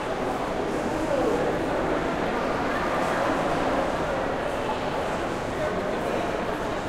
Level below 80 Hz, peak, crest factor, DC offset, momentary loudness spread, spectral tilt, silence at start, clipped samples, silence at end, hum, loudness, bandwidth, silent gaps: -42 dBFS; -12 dBFS; 14 dB; under 0.1%; 3 LU; -5.5 dB/octave; 0 s; under 0.1%; 0 s; none; -26 LUFS; 16 kHz; none